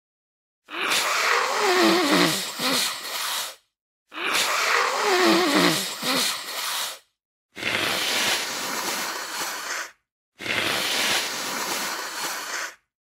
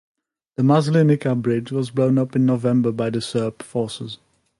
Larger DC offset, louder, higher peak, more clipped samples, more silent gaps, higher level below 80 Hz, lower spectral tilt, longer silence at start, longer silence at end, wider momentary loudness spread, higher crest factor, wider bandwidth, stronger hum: neither; second, -23 LUFS vs -20 LUFS; about the same, -2 dBFS vs -4 dBFS; neither; first, 3.81-4.06 s, 7.25-7.49 s, 10.12-10.32 s vs none; second, -70 dBFS vs -62 dBFS; second, -1.5 dB/octave vs -7.5 dB/octave; about the same, 0.7 s vs 0.6 s; about the same, 0.4 s vs 0.45 s; about the same, 12 LU vs 12 LU; first, 22 dB vs 16 dB; first, 16.5 kHz vs 11.5 kHz; neither